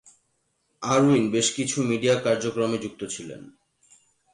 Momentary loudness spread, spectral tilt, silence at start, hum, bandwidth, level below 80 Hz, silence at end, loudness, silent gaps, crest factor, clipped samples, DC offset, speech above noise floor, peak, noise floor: 15 LU; -4.5 dB/octave; 0.8 s; none; 11.5 kHz; -64 dBFS; 0.85 s; -24 LUFS; none; 16 dB; under 0.1%; under 0.1%; 49 dB; -10 dBFS; -72 dBFS